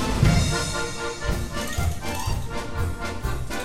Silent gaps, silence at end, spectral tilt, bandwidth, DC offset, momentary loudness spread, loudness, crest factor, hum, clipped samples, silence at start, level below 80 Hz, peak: none; 0 s; -4.5 dB/octave; 16.5 kHz; under 0.1%; 10 LU; -26 LUFS; 20 dB; none; under 0.1%; 0 s; -30 dBFS; -6 dBFS